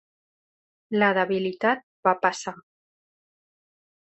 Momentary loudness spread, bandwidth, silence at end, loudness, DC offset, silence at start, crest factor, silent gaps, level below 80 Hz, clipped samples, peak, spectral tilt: 9 LU; 8.4 kHz; 1.45 s; -24 LUFS; under 0.1%; 0.9 s; 22 dB; 1.83-2.03 s; -72 dBFS; under 0.1%; -6 dBFS; -5 dB/octave